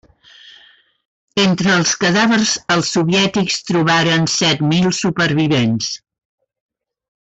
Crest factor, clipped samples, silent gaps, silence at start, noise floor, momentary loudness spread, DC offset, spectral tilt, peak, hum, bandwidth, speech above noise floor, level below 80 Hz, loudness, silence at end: 12 dB; under 0.1%; 1.05-1.28 s; 0.45 s; -49 dBFS; 5 LU; under 0.1%; -4 dB/octave; -4 dBFS; none; 8.4 kHz; 34 dB; -52 dBFS; -15 LUFS; 1.3 s